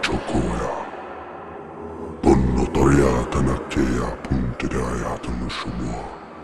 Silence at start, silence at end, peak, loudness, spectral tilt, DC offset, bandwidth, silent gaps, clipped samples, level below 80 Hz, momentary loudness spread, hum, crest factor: 0 s; 0 s; -2 dBFS; -22 LUFS; -6.5 dB/octave; 2%; 12.5 kHz; none; under 0.1%; -32 dBFS; 17 LU; none; 20 dB